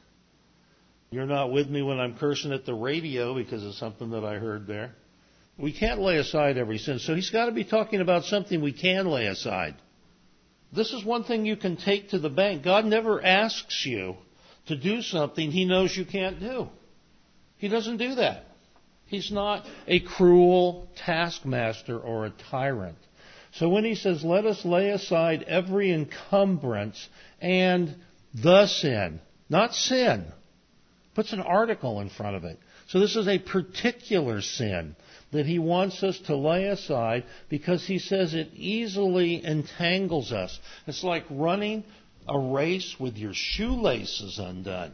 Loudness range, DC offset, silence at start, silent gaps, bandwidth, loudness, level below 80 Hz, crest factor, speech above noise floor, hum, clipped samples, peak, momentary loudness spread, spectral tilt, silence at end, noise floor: 5 LU; under 0.1%; 1.1 s; none; 6.6 kHz; -26 LUFS; -52 dBFS; 22 dB; 36 dB; none; under 0.1%; -6 dBFS; 12 LU; -5.5 dB/octave; 0 s; -62 dBFS